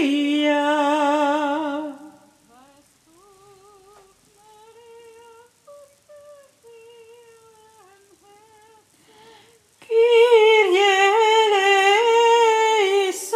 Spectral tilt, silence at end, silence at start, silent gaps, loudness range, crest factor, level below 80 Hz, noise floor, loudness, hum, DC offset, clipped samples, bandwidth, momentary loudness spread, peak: -1 dB/octave; 0 s; 0 s; none; 15 LU; 16 dB; -76 dBFS; -56 dBFS; -17 LUFS; none; under 0.1%; under 0.1%; 15.5 kHz; 9 LU; -4 dBFS